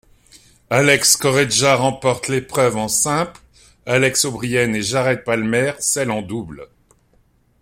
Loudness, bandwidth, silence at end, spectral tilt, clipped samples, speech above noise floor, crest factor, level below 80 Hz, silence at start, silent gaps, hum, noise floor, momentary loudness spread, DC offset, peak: -17 LUFS; 16.5 kHz; 0.95 s; -3 dB/octave; under 0.1%; 40 dB; 20 dB; -50 dBFS; 0.7 s; none; none; -58 dBFS; 10 LU; under 0.1%; 0 dBFS